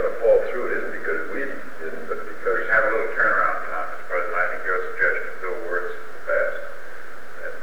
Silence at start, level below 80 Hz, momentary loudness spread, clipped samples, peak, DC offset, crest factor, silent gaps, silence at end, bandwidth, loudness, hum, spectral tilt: 0 s; -54 dBFS; 15 LU; under 0.1%; -6 dBFS; 6%; 18 dB; none; 0 s; over 20 kHz; -24 LUFS; none; -5 dB/octave